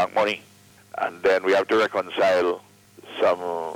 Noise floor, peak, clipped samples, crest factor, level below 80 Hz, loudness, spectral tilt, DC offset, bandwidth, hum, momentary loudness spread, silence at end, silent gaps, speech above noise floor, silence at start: -45 dBFS; -10 dBFS; under 0.1%; 14 dB; -66 dBFS; -23 LUFS; -4 dB/octave; under 0.1%; 16.5 kHz; none; 13 LU; 0 s; none; 23 dB; 0 s